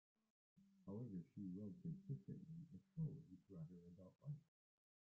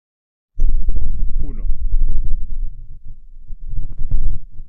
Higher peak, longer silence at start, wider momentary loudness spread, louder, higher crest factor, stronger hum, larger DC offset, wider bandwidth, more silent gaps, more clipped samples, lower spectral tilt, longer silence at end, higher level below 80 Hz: second, -38 dBFS vs -2 dBFS; about the same, 0.55 s vs 0.55 s; second, 10 LU vs 18 LU; second, -55 LUFS vs -27 LUFS; first, 16 dB vs 10 dB; neither; neither; first, 2.9 kHz vs 0.6 kHz; neither; neither; first, -12.5 dB/octave vs -10.5 dB/octave; first, 0.7 s vs 0.05 s; second, -84 dBFS vs -18 dBFS